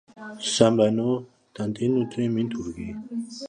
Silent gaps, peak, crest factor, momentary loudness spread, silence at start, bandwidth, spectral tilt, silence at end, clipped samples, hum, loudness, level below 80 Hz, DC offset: none; -2 dBFS; 22 dB; 14 LU; 0.15 s; 10.5 kHz; -5.5 dB/octave; 0 s; under 0.1%; none; -25 LUFS; -56 dBFS; under 0.1%